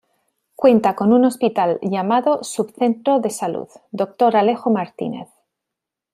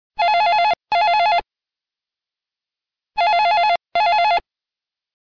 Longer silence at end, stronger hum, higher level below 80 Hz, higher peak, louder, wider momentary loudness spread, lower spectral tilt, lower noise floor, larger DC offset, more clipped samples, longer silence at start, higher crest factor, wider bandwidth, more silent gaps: about the same, 0.9 s vs 0.8 s; neither; second, -66 dBFS vs -56 dBFS; first, -2 dBFS vs -12 dBFS; about the same, -18 LUFS vs -17 LUFS; first, 12 LU vs 6 LU; first, -6 dB/octave vs -2 dB/octave; second, -84 dBFS vs -89 dBFS; neither; neither; first, 0.6 s vs 0.2 s; first, 16 dB vs 6 dB; first, 15 kHz vs 5.4 kHz; neither